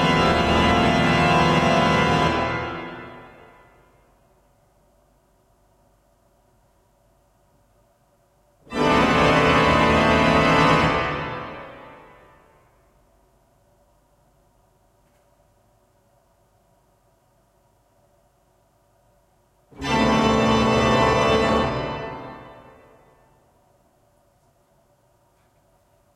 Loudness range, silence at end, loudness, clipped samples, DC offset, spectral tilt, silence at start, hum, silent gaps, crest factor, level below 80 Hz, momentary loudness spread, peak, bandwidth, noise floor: 16 LU; 3.65 s; -19 LUFS; under 0.1%; under 0.1%; -5.5 dB/octave; 0 s; none; none; 18 dB; -42 dBFS; 19 LU; -6 dBFS; 14 kHz; -62 dBFS